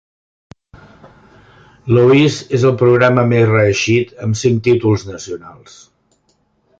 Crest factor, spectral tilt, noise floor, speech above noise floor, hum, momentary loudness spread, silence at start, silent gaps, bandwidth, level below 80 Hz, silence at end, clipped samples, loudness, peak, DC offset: 14 dB; -6.5 dB/octave; -61 dBFS; 48 dB; none; 17 LU; 1.85 s; none; 7.8 kHz; -46 dBFS; 1.3 s; under 0.1%; -13 LUFS; -2 dBFS; under 0.1%